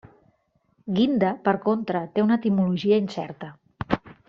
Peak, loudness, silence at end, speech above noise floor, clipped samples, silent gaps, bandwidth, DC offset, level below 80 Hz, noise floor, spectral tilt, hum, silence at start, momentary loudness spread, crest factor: -4 dBFS; -24 LUFS; 0.15 s; 45 dB; under 0.1%; none; 7.2 kHz; under 0.1%; -56 dBFS; -67 dBFS; -6 dB/octave; none; 0.85 s; 16 LU; 20 dB